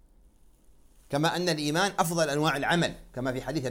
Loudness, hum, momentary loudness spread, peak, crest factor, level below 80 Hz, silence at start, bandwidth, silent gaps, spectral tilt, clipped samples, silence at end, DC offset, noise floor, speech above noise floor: -28 LUFS; none; 7 LU; -8 dBFS; 20 dB; -54 dBFS; 1.1 s; 17 kHz; none; -4.5 dB/octave; under 0.1%; 0 s; under 0.1%; -58 dBFS; 30 dB